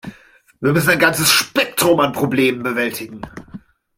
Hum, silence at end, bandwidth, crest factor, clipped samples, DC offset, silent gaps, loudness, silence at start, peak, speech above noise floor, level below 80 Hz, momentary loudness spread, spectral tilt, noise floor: none; 0.4 s; 16.5 kHz; 18 dB; under 0.1%; under 0.1%; none; -16 LUFS; 0.05 s; 0 dBFS; 32 dB; -52 dBFS; 20 LU; -3.5 dB/octave; -48 dBFS